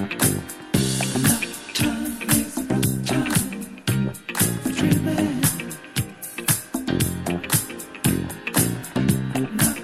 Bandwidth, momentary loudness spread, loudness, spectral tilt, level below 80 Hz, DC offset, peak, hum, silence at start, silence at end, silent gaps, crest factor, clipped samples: 16 kHz; 7 LU; -23 LUFS; -4 dB/octave; -46 dBFS; under 0.1%; -4 dBFS; none; 0 s; 0 s; none; 18 dB; under 0.1%